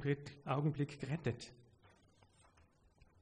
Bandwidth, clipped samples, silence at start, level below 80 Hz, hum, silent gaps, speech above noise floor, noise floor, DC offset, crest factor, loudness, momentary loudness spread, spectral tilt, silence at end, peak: 10 kHz; under 0.1%; 0 s; -70 dBFS; none; none; 30 dB; -70 dBFS; under 0.1%; 18 dB; -41 LUFS; 9 LU; -7.5 dB/octave; 1.6 s; -24 dBFS